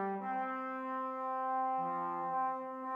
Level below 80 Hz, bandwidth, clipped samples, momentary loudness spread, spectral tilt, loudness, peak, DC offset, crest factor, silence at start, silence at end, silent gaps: under -90 dBFS; 5.2 kHz; under 0.1%; 4 LU; -8 dB/octave; -37 LUFS; -26 dBFS; under 0.1%; 10 dB; 0 s; 0 s; none